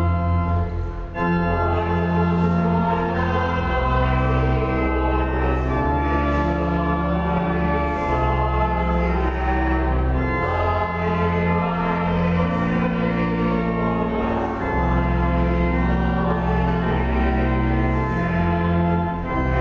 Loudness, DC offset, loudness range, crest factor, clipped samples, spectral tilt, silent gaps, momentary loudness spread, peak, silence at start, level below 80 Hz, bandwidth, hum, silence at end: -21 LUFS; under 0.1%; 1 LU; 12 dB; under 0.1%; -9 dB/octave; none; 2 LU; -8 dBFS; 0 s; -26 dBFS; 6.6 kHz; none; 0 s